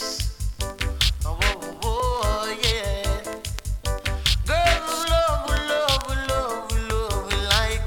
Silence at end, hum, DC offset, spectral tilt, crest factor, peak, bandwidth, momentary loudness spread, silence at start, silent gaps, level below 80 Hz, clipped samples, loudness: 0 s; none; under 0.1%; -3.5 dB/octave; 18 dB; -4 dBFS; 19 kHz; 9 LU; 0 s; none; -28 dBFS; under 0.1%; -24 LUFS